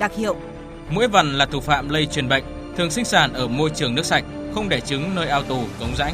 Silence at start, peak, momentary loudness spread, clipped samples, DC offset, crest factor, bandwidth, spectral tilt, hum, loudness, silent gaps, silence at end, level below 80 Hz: 0 s; 0 dBFS; 10 LU; under 0.1%; under 0.1%; 20 dB; 15.5 kHz; -4 dB/octave; none; -21 LUFS; none; 0 s; -38 dBFS